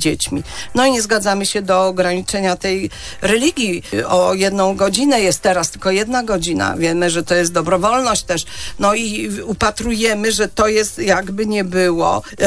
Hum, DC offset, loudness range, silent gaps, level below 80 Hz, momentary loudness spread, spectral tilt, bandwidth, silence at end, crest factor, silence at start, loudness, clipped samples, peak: none; under 0.1%; 1 LU; none; -40 dBFS; 6 LU; -3.5 dB/octave; 11 kHz; 0 s; 16 dB; 0 s; -16 LUFS; under 0.1%; 0 dBFS